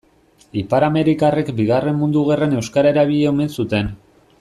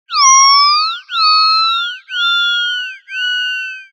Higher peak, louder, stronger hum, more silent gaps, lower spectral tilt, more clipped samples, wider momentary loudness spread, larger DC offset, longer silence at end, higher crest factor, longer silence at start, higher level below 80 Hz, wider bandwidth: second, -4 dBFS vs 0 dBFS; second, -17 LUFS vs -11 LUFS; neither; neither; first, -7 dB/octave vs 14 dB/octave; neither; second, 6 LU vs 13 LU; neither; first, 0.45 s vs 0.1 s; about the same, 14 dB vs 14 dB; first, 0.55 s vs 0.1 s; first, -46 dBFS vs under -90 dBFS; about the same, 13 kHz vs 12 kHz